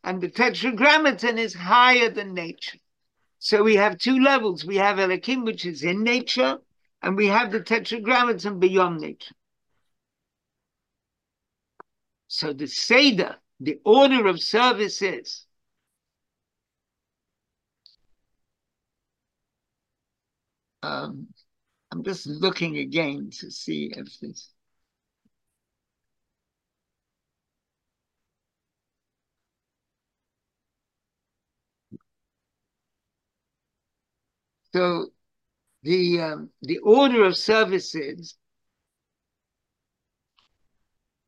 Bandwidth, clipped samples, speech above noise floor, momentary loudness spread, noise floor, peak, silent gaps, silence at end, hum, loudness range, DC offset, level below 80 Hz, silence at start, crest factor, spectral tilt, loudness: 9.8 kHz; under 0.1%; 64 dB; 19 LU; -86 dBFS; -2 dBFS; none; 2.95 s; none; 17 LU; under 0.1%; -76 dBFS; 0.05 s; 22 dB; -4.5 dB/octave; -21 LUFS